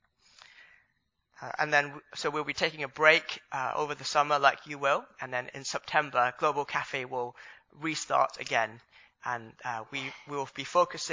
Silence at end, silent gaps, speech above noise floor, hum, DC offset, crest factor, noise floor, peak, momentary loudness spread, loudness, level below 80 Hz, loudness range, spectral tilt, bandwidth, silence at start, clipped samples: 0 s; none; 46 dB; none; under 0.1%; 26 dB; -76 dBFS; -6 dBFS; 12 LU; -30 LUFS; -74 dBFS; 5 LU; -3 dB/octave; 7.6 kHz; 0.6 s; under 0.1%